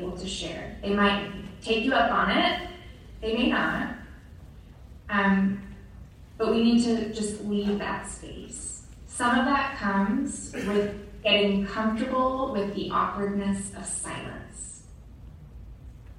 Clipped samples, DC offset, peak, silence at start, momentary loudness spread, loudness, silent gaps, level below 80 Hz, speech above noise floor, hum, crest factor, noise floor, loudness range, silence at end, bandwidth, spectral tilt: under 0.1%; under 0.1%; -8 dBFS; 0 s; 19 LU; -26 LUFS; none; -48 dBFS; 20 dB; none; 20 dB; -47 dBFS; 3 LU; 0 s; 11.5 kHz; -4.5 dB/octave